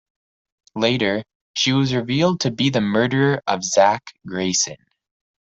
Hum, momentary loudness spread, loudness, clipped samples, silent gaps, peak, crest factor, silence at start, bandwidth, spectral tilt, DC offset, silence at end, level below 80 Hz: none; 10 LU; -20 LUFS; under 0.1%; 1.35-1.54 s; -2 dBFS; 18 dB; 0.75 s; 8 kHz; -4 dB/octave; under 0.1%; 0.65 s; -58 dBFS